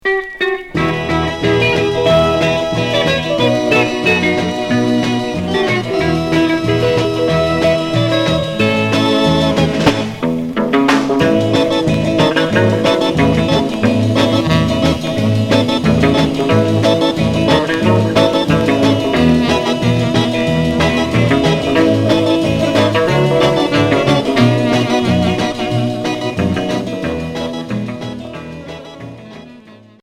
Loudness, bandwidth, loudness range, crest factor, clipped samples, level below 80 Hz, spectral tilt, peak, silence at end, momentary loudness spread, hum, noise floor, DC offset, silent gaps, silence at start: -14 LUFS; 15.5 kHz; 3 LU; 14 dB; under 0.1%; -36 dBFS; -6 dB/octave; 0 dBFS; 0.25 s; 6 LU; none; -40 dBFS; under 0.1%; none; 0.05 s